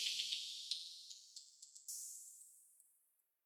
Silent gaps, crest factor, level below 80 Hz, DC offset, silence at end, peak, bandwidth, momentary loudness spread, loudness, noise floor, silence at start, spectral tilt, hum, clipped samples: none; 26 dB; under -90 dBFS; under 0.1%; 0.65 s; -22 dBFS; 18 kHz; 18 LU; -46 LUFS; -81 dBFS; 0 s; 5.5 dB/octave; none; under 0.1%